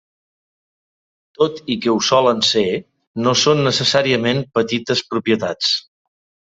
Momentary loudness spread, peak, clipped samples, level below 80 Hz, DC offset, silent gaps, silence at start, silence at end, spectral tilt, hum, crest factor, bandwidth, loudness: 7 LU; 0 dBFS; under 0.1%; -58 dBFS; under 0.1%; 3.07-3.14 s; 1.4 s; 0.75 s; -4 dB/octave; none; 18 dB; 8.2 kHz; -17 LUFS